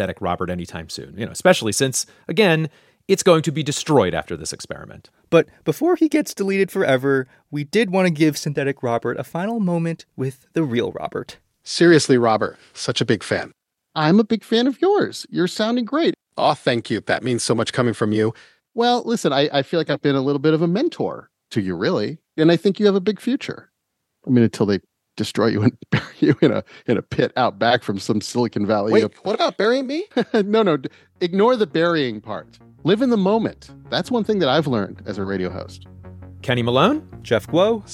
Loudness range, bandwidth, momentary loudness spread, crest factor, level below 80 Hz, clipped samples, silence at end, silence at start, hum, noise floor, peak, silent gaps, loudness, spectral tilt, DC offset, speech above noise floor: 2 LU; 16 kHz; 12 LU; 20 dB; -58 dBFS; under 0.1%; 0 s; 0 s; none; -76 dBFS; 0 dBFS; none; -20 LUFS; -5.5 dB/octave; under 0.1%; 57 dB